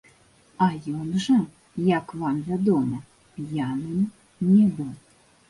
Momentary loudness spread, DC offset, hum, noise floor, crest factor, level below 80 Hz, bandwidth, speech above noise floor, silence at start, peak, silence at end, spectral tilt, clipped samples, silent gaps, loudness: 15 LU; under 0.1%; none; -57 dBFS; 18 dB; -60 dBFS; 11.5 kHz; 34 dB; 0.6 s; -8 dBFS; 0.5 s; -7.5 dB/octave; under 0.1%; none; -24 LUFS